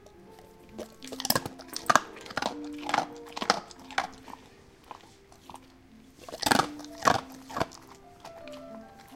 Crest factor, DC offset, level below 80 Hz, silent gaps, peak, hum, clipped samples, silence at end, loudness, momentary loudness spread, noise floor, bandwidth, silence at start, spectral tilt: 32 dB; under 0.1%; -60 dBFS; none; -2 dBFS; none; under 0.1%; 0 s; -30 LUFS; 24 LU; -55 dBFS; 17 kHz; 0 s; -2.5 dB/octave